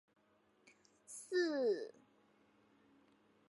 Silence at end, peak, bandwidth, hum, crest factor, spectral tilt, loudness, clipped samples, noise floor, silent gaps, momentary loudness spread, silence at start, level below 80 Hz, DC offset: 1.6 s; -26 dBFS; 11.5 kHz; none; 18 dB; -3 dB/octave; -38 LUFS; under 0.1%; -74 dBFS; none; 17 LU; 1.1 s; under -90 dBFS; under 0.1%